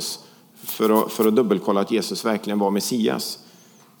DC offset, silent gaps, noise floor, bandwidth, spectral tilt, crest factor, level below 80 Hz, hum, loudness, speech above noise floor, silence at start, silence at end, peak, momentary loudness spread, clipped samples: under 0.1%; none; -51 dBFS; over 20 kHz; -4.5 dB/octave; 18 dB; -78 dBFS; none; -22 LUFS; 30 dB; 0 s; 0.6 s; -4 dBFS; 12 LU; under 0.1%